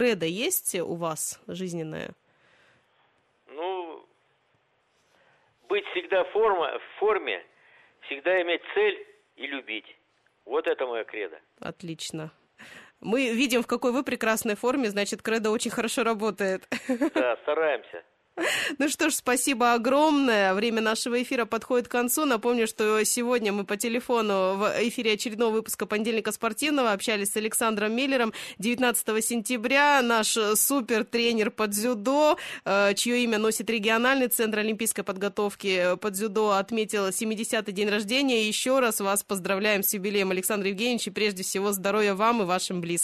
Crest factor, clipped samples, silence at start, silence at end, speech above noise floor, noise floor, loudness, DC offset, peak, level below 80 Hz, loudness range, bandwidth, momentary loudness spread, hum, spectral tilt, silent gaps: 16 dB; under 0.1%; 0 s; 0 s; 43 dB; -69 dBFS; -26 LUFS; under 0.1%; -10 dBFS; -70 dBFS; 9 LU; 13.5 kHz; 11 LU; none; -3 dB/octave; none